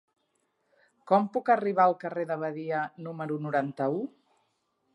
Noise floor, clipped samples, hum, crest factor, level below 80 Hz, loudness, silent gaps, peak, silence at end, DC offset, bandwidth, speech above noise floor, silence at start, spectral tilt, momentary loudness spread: -75 dBFS; under 0.1%; none; 20 dB; -86 dBFS; -28 LUFS; none; -10 dBFS; 0.85 s; under 0.1%; 10.5 kHz; 47 dB; 1.05 s; -8.5 dB/octave; 10 LU